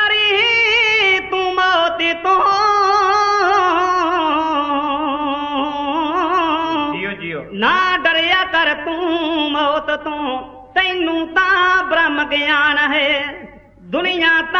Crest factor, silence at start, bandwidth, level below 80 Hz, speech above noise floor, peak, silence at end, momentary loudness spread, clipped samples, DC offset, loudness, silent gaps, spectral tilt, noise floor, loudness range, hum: 14 dB; 0 s; 7.4 kHz; -48 dBFS; 23 dB; -2 dBFS; 0 s; 8 LU; under 0.1%; under 0.1%; -15 LUFS; none; -3 dB/octave; -38 dBFS; 4 LU; none